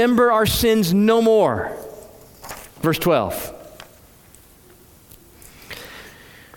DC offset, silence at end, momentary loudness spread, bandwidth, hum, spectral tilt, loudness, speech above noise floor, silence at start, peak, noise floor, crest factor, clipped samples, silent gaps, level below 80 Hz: under 0.1%; 0.45 s; 24 LU; 18 kHz; none; -5 dB/octave; -18 LUFS; 32 dB; 0 s; -4 dBFS; -49 dBFS; 16 dB; under 0.1%; none; -44 dBFS